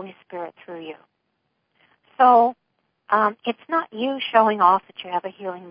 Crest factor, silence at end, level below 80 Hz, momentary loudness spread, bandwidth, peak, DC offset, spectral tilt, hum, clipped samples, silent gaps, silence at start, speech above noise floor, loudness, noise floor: 20 dB; 0 s; -78 dBFS; 21 LU; 5.2 kHz; -2 dBFS; under 0.1%; -9 dB/octave; none; under 0.1%; none; 0 s; 53 dB; -20 LUFS; -74 dBFS